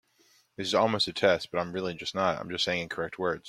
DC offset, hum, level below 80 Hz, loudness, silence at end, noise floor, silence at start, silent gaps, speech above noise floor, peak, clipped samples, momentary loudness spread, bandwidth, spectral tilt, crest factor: under 0.1%; none; -66 dBFS; -29 LUFS; 0 s; -65 dBFS; 0.6 s; none; 36 dB; -8 dBFS; under 0.1%; 8 LU; 14.5 kHz; -4 dB/octave; 22 dB